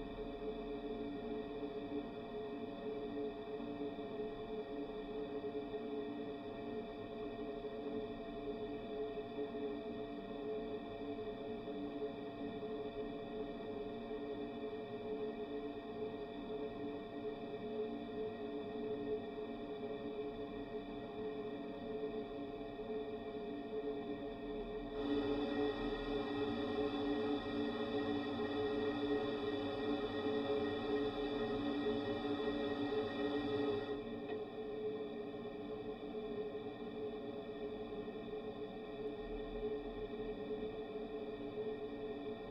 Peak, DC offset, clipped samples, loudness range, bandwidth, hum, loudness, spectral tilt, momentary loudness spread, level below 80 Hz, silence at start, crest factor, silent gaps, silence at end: -26 dBFS; under 0.1%; under 0.1%; 6 LU; 6 kHz; none; -43 LUFS; -7.5 dB/octave; 7 LU; -62 dBFS; 0 s; 16 dB; none; 0 s